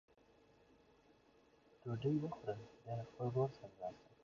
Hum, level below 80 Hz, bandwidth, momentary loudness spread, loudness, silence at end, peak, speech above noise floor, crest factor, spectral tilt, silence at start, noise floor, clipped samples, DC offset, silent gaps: none; -76 dBFS; 7.2 kHz; 11 LU; -44 LUFS; 0.2 s; -26 dBFS; 28 dB; 20 dB; -8.5 dB/octave; 1.85 s; -71 dBFS; under 0.1%; under 0.1%; none